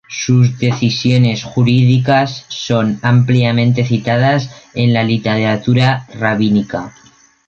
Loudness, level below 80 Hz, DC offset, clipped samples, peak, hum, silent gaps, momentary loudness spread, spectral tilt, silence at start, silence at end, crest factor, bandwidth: -14 LUFS; -48 dBFS; under 0.1%; under 0.1%; 0 dBFS; none; none; 6 LU; -6.5 dB/octave; 0.1 s; 0.55 s; 12 dB; 7 kHz